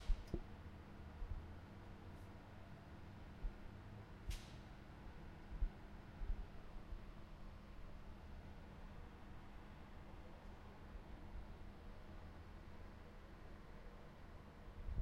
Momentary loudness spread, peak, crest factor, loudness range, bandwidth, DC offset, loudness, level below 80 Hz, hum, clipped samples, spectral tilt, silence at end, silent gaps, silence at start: 8 LU; -26 dBFS; 24 dB; 4 LU; 13 kHz; under 0.1%; -57 LUFS; -52 dBFS; none; under 0.1%; -6.5 dB/octave; 0 s; none; 0 s